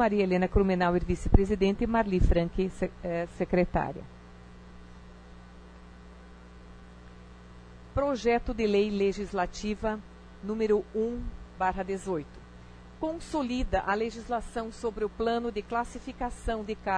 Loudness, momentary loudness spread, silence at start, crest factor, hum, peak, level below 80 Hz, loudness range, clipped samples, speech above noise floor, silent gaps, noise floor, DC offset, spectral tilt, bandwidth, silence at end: -30 LUFS; 24 LU; 0 s; 24 dB; none; -6 dBFS; -38 dBFS; 12 LU; under 0.1%; 21 dB; none; -49 dBFS; under 0.1%; -7 dB/octave; 10.5 kHz; 0 s